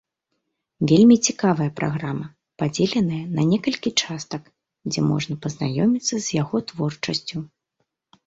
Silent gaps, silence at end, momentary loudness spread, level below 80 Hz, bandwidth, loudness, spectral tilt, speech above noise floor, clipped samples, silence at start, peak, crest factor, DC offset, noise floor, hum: none; 0.8 s; 16 LU; -58 dBFS; 8 kHz; -22 LUFS; -5 dB/octave; 56 dB; under 0.1%; 0.8 s; -4 dBFS; 18 dB; under 0.1%; -77 dBFS; none